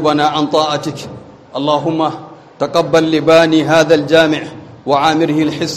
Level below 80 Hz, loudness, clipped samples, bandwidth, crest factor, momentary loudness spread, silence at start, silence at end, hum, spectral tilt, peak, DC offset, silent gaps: -52 dBFS; -13 LUFS; under 0.1%; 13.5 kHz; 14 dB; 17 LU; 0 s; 0 s; none; -5 dB/octave; 0 dBFS; under 0.1%; none